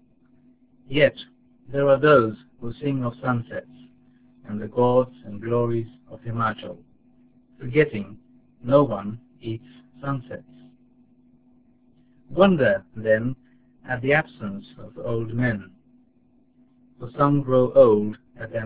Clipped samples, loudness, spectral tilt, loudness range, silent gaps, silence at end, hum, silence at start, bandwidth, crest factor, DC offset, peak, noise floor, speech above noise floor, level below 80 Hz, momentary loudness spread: under 0.1%; -22 LUFS; -11 dB/octave; 5 LU; none; 0 s; none; 0.9 s; 4 kHz; 22 dB; 0.3%; -2 dBFS; -60 dBFS; 38 dB; -54 dBFS; 21 LU